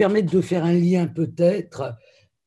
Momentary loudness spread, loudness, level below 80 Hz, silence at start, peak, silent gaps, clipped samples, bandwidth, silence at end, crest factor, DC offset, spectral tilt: 13 LU; -21 LUFS; -62 dBFS; 0 s; -6 dBFS; none; under 0.1%; 11 kHz; 0.5 s; 16 dB; under 0.1%; -8 dB/octave